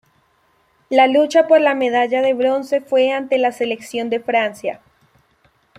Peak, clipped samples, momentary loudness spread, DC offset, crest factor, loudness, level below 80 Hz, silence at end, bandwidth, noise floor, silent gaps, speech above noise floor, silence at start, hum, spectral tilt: -2 dBFS; under 0.1%; 10 LU; under 0.1%; 16 dB; -17 LUFS; -66 dBFS; 1 s; 13.5 kHz; -60 dBFS; none; 44 dB; 0.9 s; none; -3.5 dB/octave